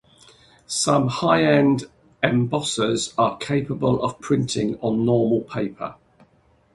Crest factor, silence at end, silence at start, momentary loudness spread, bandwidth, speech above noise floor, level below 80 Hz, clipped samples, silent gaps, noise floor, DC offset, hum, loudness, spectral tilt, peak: 20 dB; 0.8 s; 0.7 s; 9 LU; 11.5 kHz; 39 dB; -54 dBFS; under 0.1%; none; -59 dBFS; under 0.1%; none; -21 LUFS; -5 dB/octave; -2 dBFS